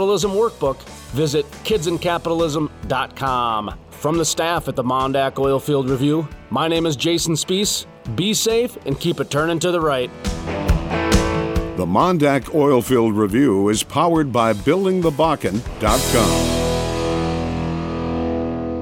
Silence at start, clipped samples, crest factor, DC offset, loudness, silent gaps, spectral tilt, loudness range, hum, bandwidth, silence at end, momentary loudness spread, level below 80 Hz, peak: 0 s; under 0.1%; 16 dB; under 0.1%; -19 LUFS; none; -5 dB/octave; 4 LU; none; 18 kHz; 0 s; 7 LU; -32 dBFS; -2 dBFS